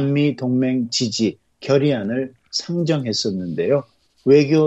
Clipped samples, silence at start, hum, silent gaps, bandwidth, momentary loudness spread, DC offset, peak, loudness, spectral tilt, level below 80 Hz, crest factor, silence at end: under 0.1%; 0 s; none; none; 8.4 kHz; 9 LU; under 0.1%; -2 dBFS; -20 LUFS; -5.5 dB/octave; -62 dBFS; 16 dB; 0 s